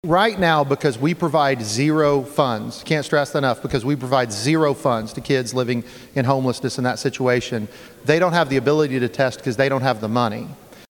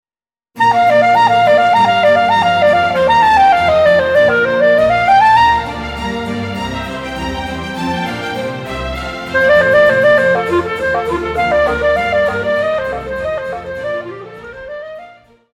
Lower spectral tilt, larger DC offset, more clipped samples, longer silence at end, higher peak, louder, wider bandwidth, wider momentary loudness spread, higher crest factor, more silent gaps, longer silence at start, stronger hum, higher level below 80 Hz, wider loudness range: about the same, -5.5 dB/octave vs -5 dB/octave; neither; neither; second, 0.05 s vs 0.45 s; about the same, -2 dBFS vs -2 dBFS; second, -20 LUFS vs -13 LUFS; first, 18 kHz vs 14 kHz; second, 7 LU vs 13 LU; first, 18 dB vs 12 dB; neither; second, 0.05 s vs 0.55 s; neither; second, -52 dBFS vs -36 dBFS; second, 2 LU vs 10 LU